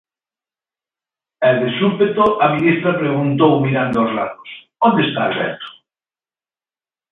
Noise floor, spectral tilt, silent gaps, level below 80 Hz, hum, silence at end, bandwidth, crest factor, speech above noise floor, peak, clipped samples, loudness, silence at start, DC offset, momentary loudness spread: under -90 dBFS; -9 dB/octave; none; -56 dBFS; none; 1.4 s; 5 kHz; 18 dB; over 74 dB; 0 dBFS; under 0.1%; -16 LUFS; 1.4 s; under 0.1%; 11 LU